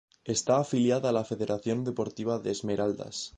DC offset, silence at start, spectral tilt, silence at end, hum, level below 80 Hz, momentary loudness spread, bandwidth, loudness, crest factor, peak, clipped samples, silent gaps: under 0.1%; 0.25 s; -5 dB/octave; 0.1 s; none; -64 dBFS; 6 LU; 10 kHz; -29 LUFS; 18 dB; -12 dBFS; under 0.1%; none